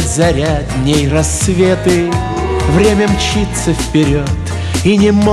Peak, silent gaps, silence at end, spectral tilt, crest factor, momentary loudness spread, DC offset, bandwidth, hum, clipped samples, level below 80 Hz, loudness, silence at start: -2 dBFS; none; 0 s; -5.5 dB/octave; 10 dB; 6 LU; under 0.1%; 13.5 kHz; none; under 0.1%; -22 dBFS; -13 LUFS; 0 s